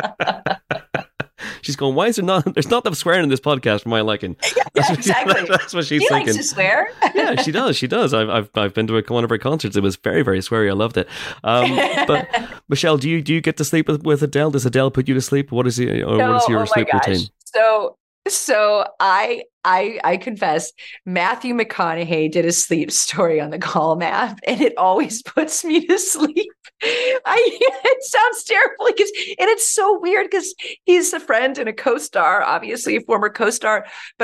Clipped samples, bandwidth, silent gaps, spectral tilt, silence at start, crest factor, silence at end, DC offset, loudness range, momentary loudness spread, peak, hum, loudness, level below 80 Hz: under 0.1%; 16 kHz; 18.00-18.22 s, 19.53-19.61 s; -4 dB/octave; 0 s; 14 dB; 0 s; under 0.1%; 2 LU; 7 LU; -4 dBFS; none; -18 LUFS; -56 dBFS